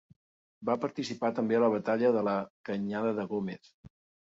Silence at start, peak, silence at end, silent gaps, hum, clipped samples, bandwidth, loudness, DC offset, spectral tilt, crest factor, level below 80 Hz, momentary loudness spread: 0.6 s; -14 dBFS; 0.35 s; 2.50-2.64 s, 3.74-3.84 s; none; under 0.1%; 7.8 kHz; -31 LUFS; under 0.1%; -7 dB/octave; 18 dB; -72 dBFS; 10 LU